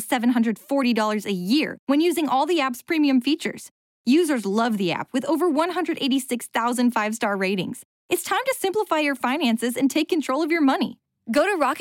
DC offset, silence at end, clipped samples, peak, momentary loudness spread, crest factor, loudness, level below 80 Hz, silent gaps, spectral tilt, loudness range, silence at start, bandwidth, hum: under 0.1%; 0 s; under 0.1%; -10 dBFS; 6 LU; 12 dB; -22 LUFS; -72 dBFS; 1.79-1.87 s, 3.71-4.04 s, 7.85-8.09 s; -4 dB/octave; 2 LU; 0 s; 17 kHz; none